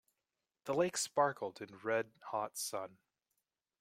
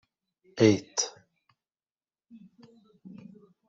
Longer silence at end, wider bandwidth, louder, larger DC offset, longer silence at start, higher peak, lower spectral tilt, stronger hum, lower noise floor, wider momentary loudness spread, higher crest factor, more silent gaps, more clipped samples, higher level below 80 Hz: first, 0.95 s vs 0.6 s; first, 16 kHz vs 8 kHz; second, -38 LUFS vs -26 LUFS; neither; about the same, 0.65 s vs 0.55 s; second, -18 dBFS vs -8 dBFS; second, -3 dB/octave vs -4.5 dB/octave; neither; about the same, under -90 dBFS vs under -90 dBFS; second, 11 LU vs 26 LU; about the same, 22 dB vs 26 dB; second, none vs 1.91-1.95 s; neither; second, -82 dBFS vs -72 dBFS